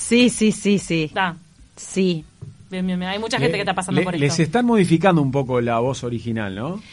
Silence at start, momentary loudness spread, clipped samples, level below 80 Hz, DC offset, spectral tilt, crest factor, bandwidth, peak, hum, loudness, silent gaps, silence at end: 0 s; 11 LU; under 0.1%; -50 dBFS; under 0.1%; -5.5 dB/octave; 18 dB; 11.5 kHz; -2 dBFS; none; -20 LUFS; none; 0 s